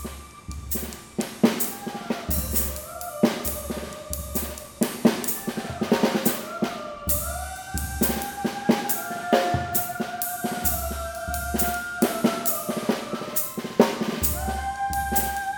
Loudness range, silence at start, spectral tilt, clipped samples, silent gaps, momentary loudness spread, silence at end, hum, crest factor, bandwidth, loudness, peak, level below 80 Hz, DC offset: 2 LU; 0 s; -4 dB/octave; under 0.1%; none; 9 LU; 0 s; none; 24 dB; 19.5 kHz; -26 LUFS; -2 dBFS; -40 dBFS; under 0.1%